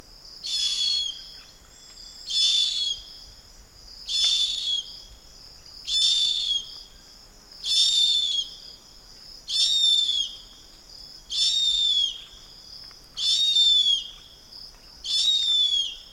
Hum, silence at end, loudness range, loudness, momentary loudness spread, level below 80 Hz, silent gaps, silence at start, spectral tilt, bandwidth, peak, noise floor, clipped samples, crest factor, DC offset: none; 0 s; 4 LU; -21 LUFS; 24 LU; -56 dBFS; none; 0.25 s; 2.5 dB/octave; 16 kHz; -8 dBFS; -49 dBFS; under 0.1%; 18 dB; under 0.1%